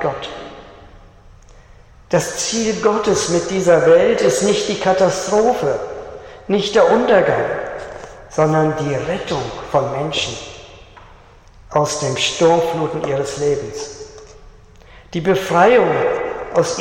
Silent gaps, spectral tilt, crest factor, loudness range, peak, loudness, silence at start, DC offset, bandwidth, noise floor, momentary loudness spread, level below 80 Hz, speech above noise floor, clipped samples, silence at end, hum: none; -4.5 dB/octave; 16 dB; 6 LU; -2 dBFS; -17 LUFS; 0 s; under 0.1%; 16 kHz; -44 dBFS; 18 LU; -46 dBFS; 28 dB; under 0.1%; 0 s; none